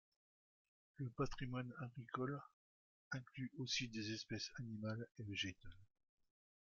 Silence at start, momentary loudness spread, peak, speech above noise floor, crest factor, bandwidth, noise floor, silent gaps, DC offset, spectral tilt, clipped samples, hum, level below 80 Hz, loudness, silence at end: 1 s; 9 LU; -28 dBFS; over 43 dB; 20 dB; 7.2 kHz; under -90 dBFS; 2.53-3.11 s; under 0.1%; -4 dB/octave; under 0.1%; none; -66 dBFS; -47 LUFS; 0.8 s